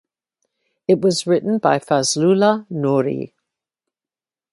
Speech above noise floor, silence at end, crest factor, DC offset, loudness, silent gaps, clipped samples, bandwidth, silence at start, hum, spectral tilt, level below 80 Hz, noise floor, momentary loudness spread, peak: over 73 dB; 1.25 s; 18 dB; under 0.1%; -18 LUFS; none; under 0.1%; 11.5 kHz; 0.9 s; none; -5 dB/octave; -66 dBFS; under -90 dBFS; 10 LU; -2 dBFS